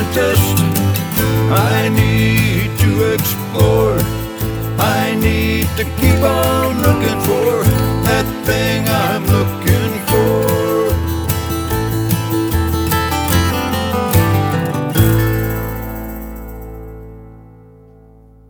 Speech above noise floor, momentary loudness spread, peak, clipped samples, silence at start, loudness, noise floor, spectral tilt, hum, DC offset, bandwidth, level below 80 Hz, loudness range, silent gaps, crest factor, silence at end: 30 dB; 8 LU; 0 dBFS; under 0.1%; 0 s; -15 LUFS; -43 dBFS; -5.5 dB/octave; none; under 0.1%; over 20 kHz; -28 dBFS; 3 LU; none; 14 dB; 1.05 s